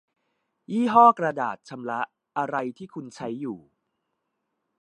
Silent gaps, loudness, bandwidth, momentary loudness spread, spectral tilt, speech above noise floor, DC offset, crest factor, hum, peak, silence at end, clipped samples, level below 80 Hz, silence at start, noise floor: none; -24 LUFS; 9.6 kHz; 19 LU; -6.5 dB/octave; 55 dB; under 0.1%; 22 dB; none; -4 dBFS; 1.2 s; under 0.1%; -76 dBFS; 0.7 s; -79 dBFS